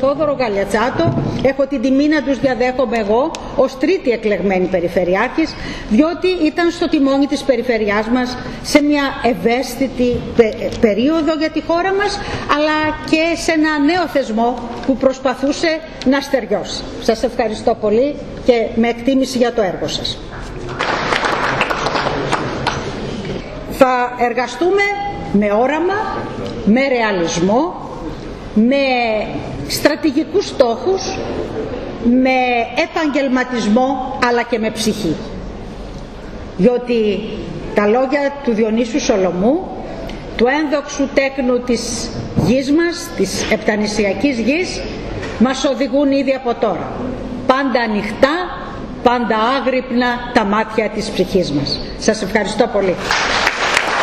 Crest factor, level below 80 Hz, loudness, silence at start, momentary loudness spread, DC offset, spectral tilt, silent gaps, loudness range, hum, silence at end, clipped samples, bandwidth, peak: 16 dB; -36 dBFS; -16 LUFS; 0 s; 9 LU; under 0.1%; -5 dB/octave; none; 2 LU; none; 0 s; under 0.1%; 13.5 kHz; 0 dBFS